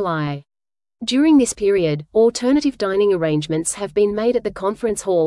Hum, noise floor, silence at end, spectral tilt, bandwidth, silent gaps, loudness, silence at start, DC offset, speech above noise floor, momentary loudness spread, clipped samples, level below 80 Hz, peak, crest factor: none; -56 dBFS; 0 s; -5 dB/octave; 12 kHz; none; -18 LUFS; 0 s; under 0.1%; 38 dB; 9 LU; under 0.1%; -50 dBFS; -4 dBFS; 14 dB